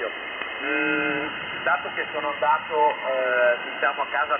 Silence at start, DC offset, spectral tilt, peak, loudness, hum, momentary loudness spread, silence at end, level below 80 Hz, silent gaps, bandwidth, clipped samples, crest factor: 0 s; under 0.1%; -6.5 dB/octave; -8 dBFS; -24 LUFS; none; 7 LU; 0 s; -66 dBFS; none; 3.6 kHz; under 0.1%; 16 dB